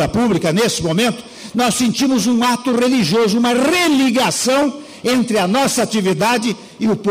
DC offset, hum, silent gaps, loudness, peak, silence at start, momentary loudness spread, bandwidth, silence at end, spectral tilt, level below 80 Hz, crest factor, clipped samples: under 0.1%; none; none; -16 LUFS; -8 dBFS; 0 s; 6 LU; 16 kHz; 0 s; -4 dB/octave; -48 dBFS; 8 dB; under 0.1%